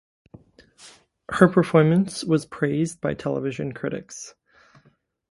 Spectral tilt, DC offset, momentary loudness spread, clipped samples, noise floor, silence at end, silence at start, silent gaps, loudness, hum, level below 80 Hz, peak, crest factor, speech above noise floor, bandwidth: -6.5 dB/octave; under 0.1%; 15 LU; under 0.1%; -62 dBFS; 1 s; 0.85 s; none; -22 LUFS; none; -58 dBFS; 0 dBFS; 24 dB; 40 dB; 11.5 kHz